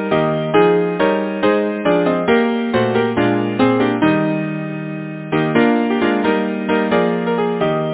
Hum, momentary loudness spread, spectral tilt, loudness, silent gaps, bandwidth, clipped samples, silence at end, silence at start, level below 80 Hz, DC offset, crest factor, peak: none; 6 LU; -10.5 dB/octave; -17 LUFS; none; 4 kHz; under 0.1%; 0 s; 0 s; -50 dBFS; under 0.1%; 16 dB; 0 dBFS